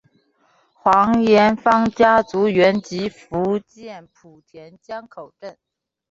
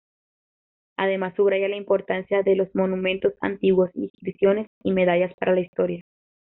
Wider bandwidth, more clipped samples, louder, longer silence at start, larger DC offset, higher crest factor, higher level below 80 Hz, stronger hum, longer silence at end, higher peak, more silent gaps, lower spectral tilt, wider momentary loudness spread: first, 7.8 kHz vs 3.9 kHz; neither; first, -17 LUFS vs -23 LUFS; second, 0.85 s vs 1 s; neither; about the same, 18 dB vs 14 dB; first, -54 dBFS vs -62 dBFS; neither; about the same, 0.6 s vs 0.55 s; first, -2 dBFS vs -8 dBFS; second, none vs 4.10-4.14 s, 4.67-4.81 s, 5.34-5.38 s, 5.68-5.73 s; about the same, -6 dB/octave vs -5 dB/octave; first, 23 LU vs 6 LU